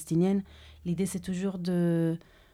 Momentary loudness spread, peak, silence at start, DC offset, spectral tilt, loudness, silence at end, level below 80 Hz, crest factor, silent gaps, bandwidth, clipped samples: 12 LU; -16 dBFS; 0 s; under 0.1%; -7 dB/octave; -30 LUFS; 0.35 s; -58 dBFS; 14 dB; none; 14 kHz; under 0.1%